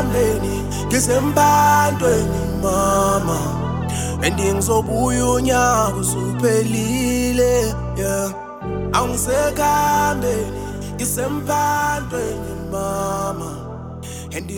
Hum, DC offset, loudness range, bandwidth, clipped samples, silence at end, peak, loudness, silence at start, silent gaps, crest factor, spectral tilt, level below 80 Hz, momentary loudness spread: none; under 0.1%; 5 LU; 19 kHz; under 0.1%; 0 s; -2 dBFS; -19 LUFS; 0 s; none; 18 dB; -4.5 dB/octave; -32 dBFS; 11 LU